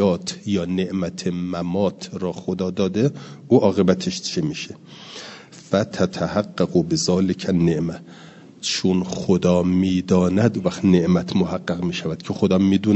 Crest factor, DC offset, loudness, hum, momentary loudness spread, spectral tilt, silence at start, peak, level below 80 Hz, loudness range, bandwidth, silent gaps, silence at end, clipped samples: 18 dB; under 0.1%; -21 LUFS; none; 11 LU; -6 dB/octave; 0 s; -2 dBFS; -56 dBFS; 4 LU; 8.4 kHz; none; 0 s; under 0.1%